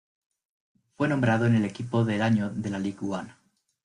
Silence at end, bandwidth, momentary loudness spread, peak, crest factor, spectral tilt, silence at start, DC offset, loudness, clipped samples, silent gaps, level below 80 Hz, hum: 0.55 s; 10.5 kHz; 10 LU; -10 dBFS; 16 dB; -7.5 dB/octave; 1 s; under 0.1%; -26 LUFS; under 0.1%; none; -62 dBFS; none